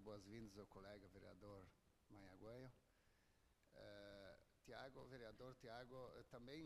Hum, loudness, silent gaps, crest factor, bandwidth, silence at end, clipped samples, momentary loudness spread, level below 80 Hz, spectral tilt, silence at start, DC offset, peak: none; -62 LUFS; none; 18 dB; 13 kHz; 0 s; under 0.1%; 7 LU; -76 dBFS; -5.5 dB/octave; 0 s; under 0.1%; -44 dBFS